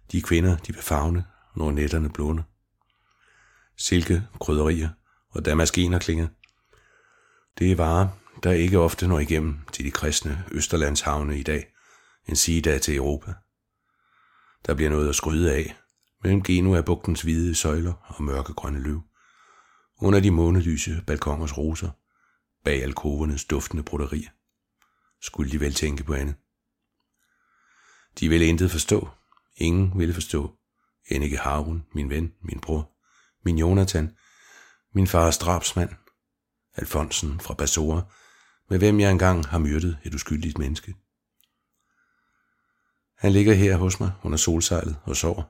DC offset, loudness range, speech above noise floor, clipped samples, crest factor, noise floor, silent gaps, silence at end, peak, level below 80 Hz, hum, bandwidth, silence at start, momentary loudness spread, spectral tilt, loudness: under 0.1%; 6 LU; 58 dB; under 0.1%; 22 dB; -81 dBFS; none; 0.05 s; -4 dBFS; -34 dBFS; none; 16.5 kHz; 0.1 s; 12 LU; -5 dB/octave; -24 LUFS